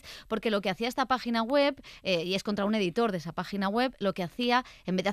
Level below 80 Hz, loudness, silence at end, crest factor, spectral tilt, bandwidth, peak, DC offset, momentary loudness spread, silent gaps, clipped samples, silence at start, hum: -60 dBFS; -29 LUFS; 0 s; 16 dB; -5.5 dB/octave; 14.5 kHz; -12 dBFS; under 0.1%; 6 LU; none; under 0.1%; 0.05 s; none